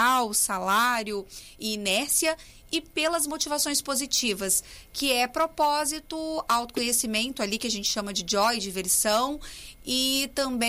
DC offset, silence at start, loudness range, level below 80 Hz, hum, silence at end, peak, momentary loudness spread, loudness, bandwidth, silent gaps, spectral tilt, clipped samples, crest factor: under 0.1%; 0 s; 1 LU; -52 dBFS; none; 0 s; -10 dBFS; 9 LU; -25 LUFS; 16 kHz; none; -1 dB/octave; under 0.1%; 16 dB